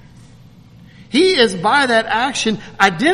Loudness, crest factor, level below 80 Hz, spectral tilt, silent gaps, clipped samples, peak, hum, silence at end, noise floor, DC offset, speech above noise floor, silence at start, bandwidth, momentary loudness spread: -15 LUFS; 16 dB; -50 dBFS; -3.5 dB/octave; none; under 0.1%; 0 dBFS; none; 0 s; -43 dBFS; under 0.1%; 28 dB; 1 s; 13 kHz; 7 LU